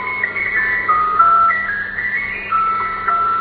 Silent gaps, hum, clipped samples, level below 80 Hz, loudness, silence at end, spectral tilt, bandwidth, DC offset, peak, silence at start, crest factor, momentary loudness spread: none; none; under 0.1%; -46 dBFS; -15 LUFS; 0 s; -8.5 dB/octave; 4.8 kHz; under 0.1%; 0 dBFS; 0 s; 16 dB; 8 LU